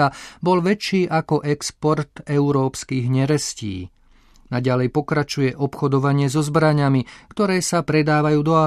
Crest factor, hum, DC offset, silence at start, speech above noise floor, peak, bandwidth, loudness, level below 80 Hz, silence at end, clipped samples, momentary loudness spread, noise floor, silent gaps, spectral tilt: 16 dB; none; under 0.1%; 0 s; 32 dB; -4 dBFS; 13.5 kHz; -20 LUFS; -50 dBFS; 0 s; under 0.1%; 7 LU; -52 dBFS; none; -6 dB/octave